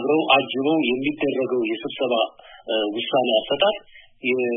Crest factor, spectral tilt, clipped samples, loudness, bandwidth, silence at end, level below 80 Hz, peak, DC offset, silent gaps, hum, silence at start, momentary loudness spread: 20 dB; -9 dB/octave; under 0.1%; -22 LUFS; 3.8 kHz; 0 s; -62 dBFS; -2 dBFS; under 0.1%; none; none; 0 s; 8 LU